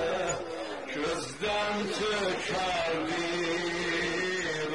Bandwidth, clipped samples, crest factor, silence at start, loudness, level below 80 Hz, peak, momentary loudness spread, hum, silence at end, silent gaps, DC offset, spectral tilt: 11.5 kHz; under 0.1%; 12 dB; 0 s; -30 LUFS; -58 dBFS; -18 dBFS; 4 LU; none; 0 s; none; 0.2%; -3.5 dB/octave